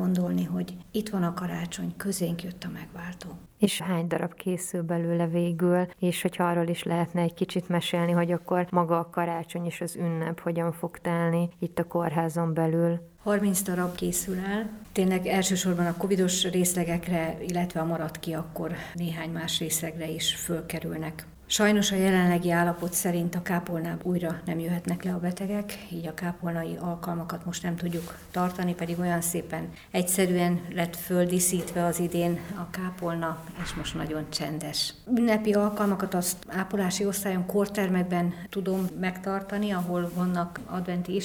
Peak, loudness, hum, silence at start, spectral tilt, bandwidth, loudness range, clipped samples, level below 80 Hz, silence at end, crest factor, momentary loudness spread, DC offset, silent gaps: -8 dBFS; -28 LUFS; none; 0 s; -5 dB/octave; over 20 kHz; 5 LU; under 0.1%; -54 dBFS; 0 s; 20 dB; 9 LU; under 0.1%; none